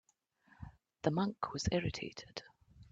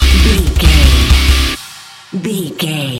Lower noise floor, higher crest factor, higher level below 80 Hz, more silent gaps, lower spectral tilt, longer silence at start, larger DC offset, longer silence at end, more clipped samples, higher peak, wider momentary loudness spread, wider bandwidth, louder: first, -70 dBFS vs -34 dBFS; first, 22 dB vs 10 dB; second, -58 dBFS vs -12 dBFS; neither; about the same, -5.5 dB/octave vs -4.5 dB/octave; first, 0.6 s vs 0 s; neither; about the same, 0.1 s vs 0 s; second, under 0.1% vs 0.2%; second, -18 dBFS vs 0 dBFS; first, 20 LU vs 15 LU; second, 7.8 kHz vs 16.5 kHz; second, -38 LUFS vs -12 LUFS